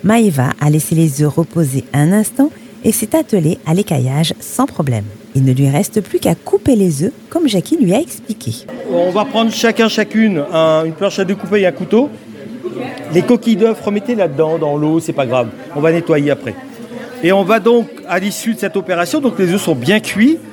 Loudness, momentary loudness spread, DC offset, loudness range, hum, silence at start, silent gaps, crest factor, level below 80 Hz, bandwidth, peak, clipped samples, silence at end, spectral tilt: -14 LUFS; 9 LU; under 0.1%; 2 LU; none; 0 s; none; 14 dB; -54 dBFS; 18 kHz; 0 dBFS; under 0.1%; 0 s; -6 dB/octave